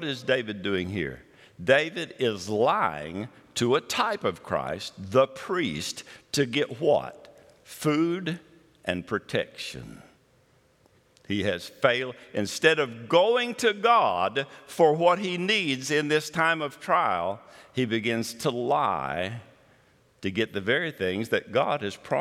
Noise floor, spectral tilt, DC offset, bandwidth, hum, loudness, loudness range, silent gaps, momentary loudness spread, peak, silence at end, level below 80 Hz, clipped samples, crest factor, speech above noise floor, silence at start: -63 dBFS; -4.5 dB/octave; under 0.1%; 16 kHz; none; -26 LUFS; 8 LU; none; 12 LU; -4 dBFS; 0 s; -66 dBFS; under 0.1%; 22 dB; 36 dB; 0 s